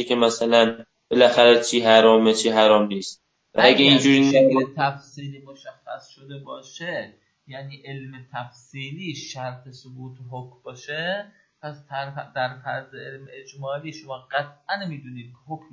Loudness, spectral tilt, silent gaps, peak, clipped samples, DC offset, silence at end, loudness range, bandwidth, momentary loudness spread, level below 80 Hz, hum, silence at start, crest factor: -19 LUFS; -4 dB/octave; none; 0 dBFS; under 0.1%; under 0.1%; 0.15 s; 19 LU; 8 kHz; 25 LU; -70 dBFS; none; 0 s; 22 dB